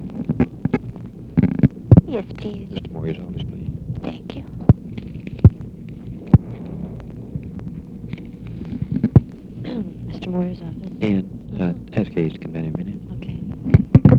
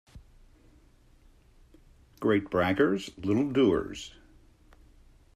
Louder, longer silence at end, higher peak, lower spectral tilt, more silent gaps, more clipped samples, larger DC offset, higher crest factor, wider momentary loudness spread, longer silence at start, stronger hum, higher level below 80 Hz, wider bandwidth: first, -21 LUFS vs -27 LUFS; second, 0 s vs 1.25 s; first, 0 dBFS vs -12 dBFS; first, -10.5 dB/octave vs -6.5 dB/octave; neither; neither; neither; about the same, 20 dB vs 18 dB; first, 18 LU vs 14 LU; second, 0 s vs 0.15 s; neither; first, -34 dBFS vs -56 dBFS; second, 5.2 kHz vs 13.5 kHz